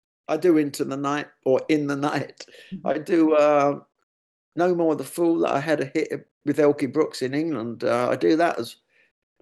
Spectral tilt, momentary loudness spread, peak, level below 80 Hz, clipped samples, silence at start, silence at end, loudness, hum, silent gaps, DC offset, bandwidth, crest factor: -6 dB/octave; 11 LU; -8 dBFS; -74 dBFS; under 0.1%; 0.3 s; 0.7 s; -23 LUFS; none; 4.03-4.52 s, 6.31-6.41 s; under 0.1%; 12.5 kHz; 16 dB